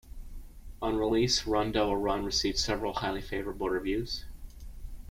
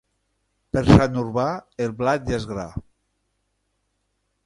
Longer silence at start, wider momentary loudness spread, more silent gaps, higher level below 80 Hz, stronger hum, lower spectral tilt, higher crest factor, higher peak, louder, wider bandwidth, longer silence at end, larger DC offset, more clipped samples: second, 0.05 s vs 0.75 s; first, 23 LU vs 16 LU; neither; second, -44 dBFS vs -38 dBFS; neither; second, -4 dB/octave vs -7.5 dB/octave; second, 18 dB vs 24 dB; second, -14 dBFS vs 0 dBFS; second, -30 LUFS vs -21 LUFS; first, 16.5 kHz vs 11.5 kHz; second, 0 s vs 1.65 s; neither; neither